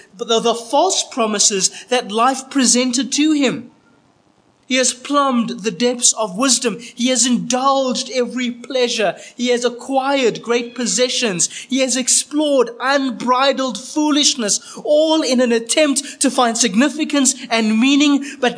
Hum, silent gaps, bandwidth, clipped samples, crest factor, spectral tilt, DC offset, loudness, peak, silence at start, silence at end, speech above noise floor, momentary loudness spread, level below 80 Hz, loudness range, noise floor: none; none; 10.5 kHz; under 0.1%; 16 dB; -2 dB/octave; under 0.1%; -16 LUFS; 0 dBFS; 0.15 s; 0 s; 39 dB; 6 LU; -74 dBFS; 3 LU; -56 dBFS